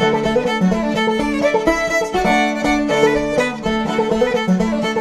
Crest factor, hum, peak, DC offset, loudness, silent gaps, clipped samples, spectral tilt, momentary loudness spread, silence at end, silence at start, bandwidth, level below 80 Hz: 16 dB; none; -2 dBFS; under 0.1%; -17 LUFS; none; under 0.1%; -5.5 dB/octave; 3 LU; 0 s; 0 s; 14 kHz; -38 dBFS